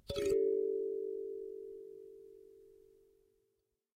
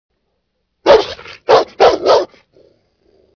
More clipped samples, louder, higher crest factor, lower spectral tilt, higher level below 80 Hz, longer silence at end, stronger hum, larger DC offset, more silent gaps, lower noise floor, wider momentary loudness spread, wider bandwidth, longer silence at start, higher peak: second, under 0.1% vs 0.1%; second, -37 LUFS vs -12 LUFS; about the same, 16 dB vs 16 dB; first, -5.5 dB/octave vs -3.5 dB/octave; second, -64 dBFS vs -46 dBFS; about the same, 1.25 s vs 1.15 s; neither; neither; neither; first, -83 dBFS vs -69 dBFS; first, 23 LU vs 15 LU; first, 15 kHz vs 5.4 kHz; second, 0.1 s vs 0.85 s; second, -24 dBFS vs 0 dBFS